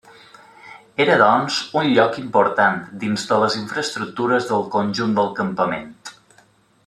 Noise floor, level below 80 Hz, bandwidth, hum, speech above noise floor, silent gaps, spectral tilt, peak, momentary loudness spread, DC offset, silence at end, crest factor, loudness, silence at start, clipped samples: -55 dBFS; -64 dBFS; 13 kHz; none; 37 dB; none; -4.5 dB/octave; -2 dBFS; 10 LU; under 0.1%; 0.75 s; 18 dB; -19 LUFS; 0.65 s; under 0.1%